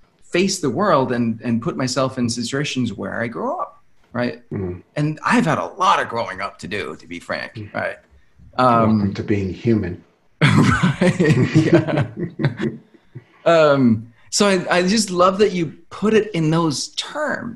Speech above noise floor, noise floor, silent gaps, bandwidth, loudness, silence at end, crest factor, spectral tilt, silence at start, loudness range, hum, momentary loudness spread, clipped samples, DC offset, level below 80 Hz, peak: 29 dB; -48 dBFS; none; 12.5 kHz; -19 LUFS; 0 s; 18 dB; -5.5 dB/octave; 0.35 s; 6 LU; none; 13 LU; under 0.1%; 0.2%; -50 dBFS; -2 dBFS